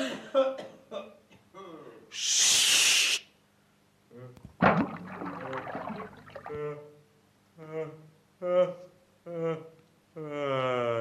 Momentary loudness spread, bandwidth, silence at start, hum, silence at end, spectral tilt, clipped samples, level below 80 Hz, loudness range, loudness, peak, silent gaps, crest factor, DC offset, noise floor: 26 LU; 15.5 kHz; 0 s; none; 0 s; -2 dB/octave; under 0.1%; -66 dBFS; 12 LU; -27 LUFS; -8 dBFS; none; 24 dB; under 0.1%; -65 dBFS